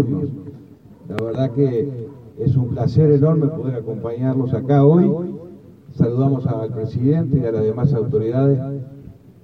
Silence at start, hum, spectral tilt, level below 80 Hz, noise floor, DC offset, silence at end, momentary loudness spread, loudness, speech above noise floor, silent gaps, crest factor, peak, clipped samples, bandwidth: 0 s; none; -11 dB/octave; -48 dBFS; -40 dBFS; under 0.1%; 0.3 s; 16 LU; -19 LUFS; 22 dB; none; 16 dB; -2 dBFS; under 0.1%; 5.4 kHz